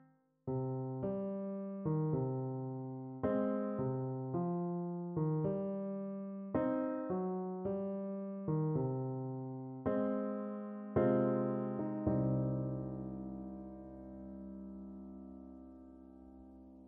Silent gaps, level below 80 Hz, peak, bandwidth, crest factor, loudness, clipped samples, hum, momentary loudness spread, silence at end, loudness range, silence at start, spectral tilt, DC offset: none; -64 dBFS; -20 dBFS; 3.4 kHz; 18 dB; -38 LUFS; under 0.1%; none; 16 LU; 0 s; 8 LU; 0.45 s; -11 dB/octave; under 0.1%